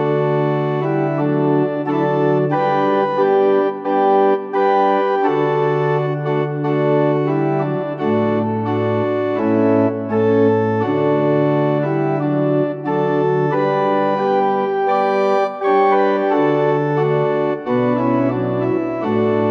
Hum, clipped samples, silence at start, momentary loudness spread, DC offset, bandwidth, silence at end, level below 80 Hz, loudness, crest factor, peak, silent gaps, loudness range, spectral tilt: none; under 0.1%; 0 s; 4 LU; under 0.1%; 6.2 kHz; 0 s; -60 dBFS; -17 LUFS; 12 dB; -4 dBFS; none; 2 LU; -9.5 dB/octave